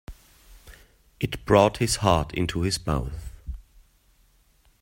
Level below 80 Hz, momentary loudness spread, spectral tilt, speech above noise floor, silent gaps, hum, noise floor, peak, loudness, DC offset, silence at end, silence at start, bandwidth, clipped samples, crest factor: -40 dBFS; 21 LU; -5 dB/octave; 38 dB; none; none; -61 dBFS; -2 dBFS; -24 LUFS; under 0.1%; 1.2 s; 0.1 s; 16.5 kHz; under 0.1%; 24 dB